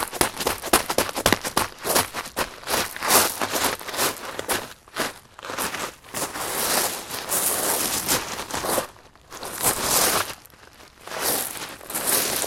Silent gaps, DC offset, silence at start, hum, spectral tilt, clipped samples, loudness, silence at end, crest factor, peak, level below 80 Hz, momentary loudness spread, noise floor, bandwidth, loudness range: none; under 0.1%; 0 s; none; -1 dB/octave; under 0.1%; -23 LUFS; 0 s; 26 dB; 0 dBFS; -50 dBFS; 13 LU; -48 dBFS; 16.5 kHz; 4 LU